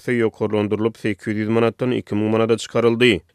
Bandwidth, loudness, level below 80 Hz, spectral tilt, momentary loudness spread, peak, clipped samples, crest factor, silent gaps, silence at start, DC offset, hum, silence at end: 13 kHz; -20 LUFS; -56 dBFS; -6 dB/octave; 7 LU; -2 dBFS; under 0.1%; 16 dB; none; 0.05 s; under 0.1%; none; 0.15 s